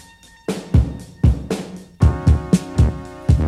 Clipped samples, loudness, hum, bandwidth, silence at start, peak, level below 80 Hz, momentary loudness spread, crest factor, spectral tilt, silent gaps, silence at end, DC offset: under 0.1%; -19 LUFS; none; 12.5 kHz; 0.5 s; -2 dBFS; -22 dBFS; 11 LU; 16 dB; -7.5 dB/octave; none; 0 s; under 0.1%